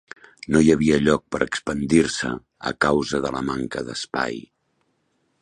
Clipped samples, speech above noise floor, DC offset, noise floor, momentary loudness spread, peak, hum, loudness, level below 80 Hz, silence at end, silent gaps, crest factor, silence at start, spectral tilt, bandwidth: under 0.1%; 48 dB; under 0.1%; -70 dBFS; 12 LU; -2 dBFS; none; -22 LUFS; -46 dBFS; 1 s; none; 20 dB; 0.5 s; -5 dB/octave; 11.5 kHz